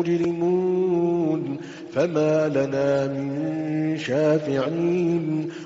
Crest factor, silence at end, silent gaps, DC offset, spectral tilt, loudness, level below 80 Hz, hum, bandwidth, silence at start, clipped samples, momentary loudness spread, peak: 12 dB; 0 s; none; under 0.1%; -7 dB/octave; -23 LUFS; -64 dBFS; none; 7.8 kHz; 0 s; under 0.1%; 6 LU; -10 dBFS